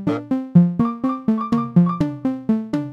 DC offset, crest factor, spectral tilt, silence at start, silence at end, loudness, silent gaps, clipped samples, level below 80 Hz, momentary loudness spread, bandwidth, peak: under 0.1%; 16 dB; -10 dB/octave; 0 s; 0 s; -19 LUFS; none; under 0.1%; -50 dBFS; 7 LU; 5.8 kHz; -2 dBFS